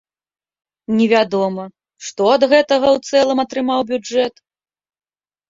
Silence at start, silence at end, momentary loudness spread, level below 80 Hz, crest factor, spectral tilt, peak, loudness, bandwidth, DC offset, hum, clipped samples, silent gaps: 0.9 s; 1.2 s; 17 LU; -60 dBFS; 16 dB; -4.5 dB/octave; -2 dBFS; -16 LUFS; 7.8 kHz; under 0.1%; none; under 0.1%; none